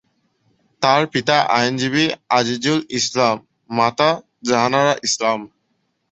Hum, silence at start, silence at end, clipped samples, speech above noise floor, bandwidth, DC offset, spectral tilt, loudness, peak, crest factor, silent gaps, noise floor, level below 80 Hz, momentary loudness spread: none; 0.8 s; 0.65 s; under 0.1%; 51 dB; 8.4 kHz; under 0.1%; -3.5 dB/octave; -18 LUFS; 0 dBFS; 18 dB; none; -69 dBFS; -60 dBFS; 5 LU